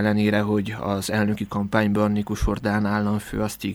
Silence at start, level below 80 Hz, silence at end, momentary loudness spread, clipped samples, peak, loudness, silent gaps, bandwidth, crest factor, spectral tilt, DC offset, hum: 0 s; -38 dBFS; 0 s; 6 LU; under 0.1%; -6 dBFS; -23 LUFS; none; 17 kHz; 16 dB; -6 dB/octave; under 0.1%; none